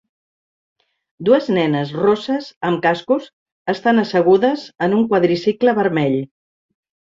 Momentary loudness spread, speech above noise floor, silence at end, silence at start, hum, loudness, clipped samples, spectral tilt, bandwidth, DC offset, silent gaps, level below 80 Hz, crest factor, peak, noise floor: 8 LU; over 74 dB; 0.95 s; 1.2 s; none; -17 LUFS; under 0.1%; -7.5 dB/octave; 7.6 kHz; under 0.1%; 2.56-2.61 s, 3.33-3.46 s, 3.52-3.65 s; -62 dBFS; 16 dB; -2 dBFS; under -90 dBFS